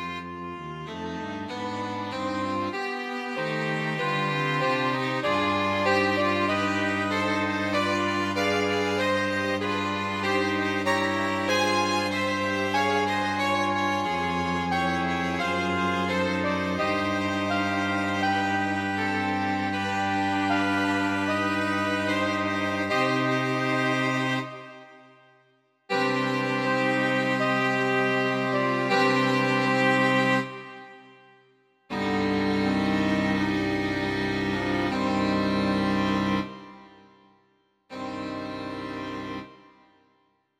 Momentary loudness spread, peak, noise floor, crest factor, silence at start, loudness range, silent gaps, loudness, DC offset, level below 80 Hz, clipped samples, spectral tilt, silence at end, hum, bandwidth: 11 LU; -10 dBFS; -68 dBFS; 16 dB; 0 s; 5 LU; none; -25 LUFS; under 0.1%; -58 dBFS; under 0.1%; -5 dB/octave; 1.05 s; none; 15.5 kHz